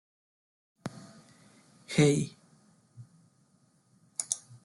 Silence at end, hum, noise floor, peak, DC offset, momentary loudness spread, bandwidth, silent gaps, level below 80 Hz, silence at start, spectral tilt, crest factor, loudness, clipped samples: 0.1 s; none; -67 dBFS; -10 dBFS; under 0.1%; 22 LU; 12 kHz; none; -70 dBFS; 0.85 s; -5 dB/octave; 26 dB; -30 LUFS; under 0.1%